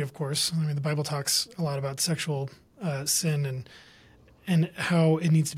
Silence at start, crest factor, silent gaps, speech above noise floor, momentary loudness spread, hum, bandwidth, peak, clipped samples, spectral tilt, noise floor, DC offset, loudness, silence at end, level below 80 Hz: 0 s; 16 dB; none; 29 dB; 11 LU; none; 16 kHz; -12 dBFS; under 0.1%; -4.5 dB/octave; -56 dBFS; under 0.1%; -27 LUFS; 0 s; -64 dBFS